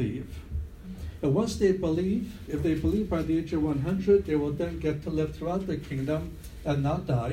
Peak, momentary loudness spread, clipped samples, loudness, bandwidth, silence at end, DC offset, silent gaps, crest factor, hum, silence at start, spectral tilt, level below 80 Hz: -12 dBFS; 13 LU; under 0.1%; -29 LUFS; 16 kHz; 0 s; under 0.1%; none; 16 dB; none; 0 s; -7.5 dB/octave; -42 dBFS